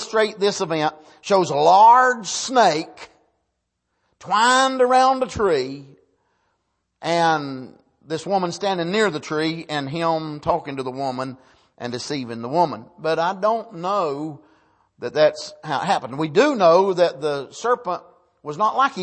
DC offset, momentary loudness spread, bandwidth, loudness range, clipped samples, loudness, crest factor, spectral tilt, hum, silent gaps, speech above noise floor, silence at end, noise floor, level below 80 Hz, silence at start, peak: under 0.1%; 16 LU; 8.8 kHz; 7 LU; under 0.1%; -20 LUFS; 18 dB; -4 dB/octave; none; none; 55 dB; 0 s; -75 dBFS; -58 dBFS; 0 s; -2 dBFS